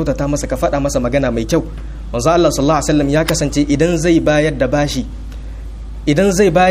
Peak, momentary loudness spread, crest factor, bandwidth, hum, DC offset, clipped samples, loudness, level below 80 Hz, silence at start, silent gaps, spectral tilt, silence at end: 0 dBFS; 17 LU; 14 dB; 15.5 kHz; none; under 0.1%; under 0.1%; -15 LUFS; -26 dBFS; 0 s; none; -5.5 dB/octave; 0 s